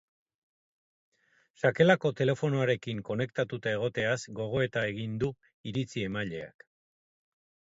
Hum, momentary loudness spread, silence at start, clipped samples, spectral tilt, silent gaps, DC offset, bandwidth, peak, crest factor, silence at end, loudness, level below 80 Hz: none; 11 LU; 1.65 s; under 0.1%; -6 dB/octave; 5.54-5.64 s; under 0.1%; 8 kHz; -10 dBFS; 22 dB; 1.25 s; -30 LUFS; -62 dBFS